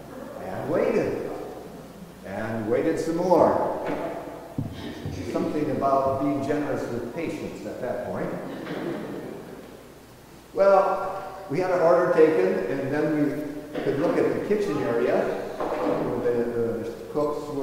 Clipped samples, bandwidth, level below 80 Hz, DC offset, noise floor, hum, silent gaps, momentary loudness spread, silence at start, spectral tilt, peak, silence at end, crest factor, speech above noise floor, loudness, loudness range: under 0.1%; 16 kHz; -52 dBFS; under 0.1%; -47 dBFS; none; none; 17 LU; 0 s; -7 dB/octave; -6 dBFS; 0 s; 20 dB; 25 dB; -25 LUFS; 7 LU